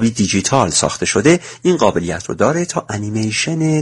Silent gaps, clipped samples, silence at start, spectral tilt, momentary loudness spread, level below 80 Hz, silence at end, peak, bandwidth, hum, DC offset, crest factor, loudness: none; under 0.1%; 0 s; -4.5 dB/octave; 7 LU; -46 dBFS; 0 s; 0 dBFS; 11.5 kHz; none; under 0.1%; 16 dB; -16 LUFS